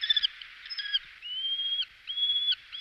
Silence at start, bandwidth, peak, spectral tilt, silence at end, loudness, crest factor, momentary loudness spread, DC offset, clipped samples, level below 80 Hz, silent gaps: 0 s; 12 kHz; -14 dBFS; 2 dB/octave; 0 s; -29 LUFS; 18 dB; 11 LU; under 0.1%; under 0.1%; -70 dBFS; none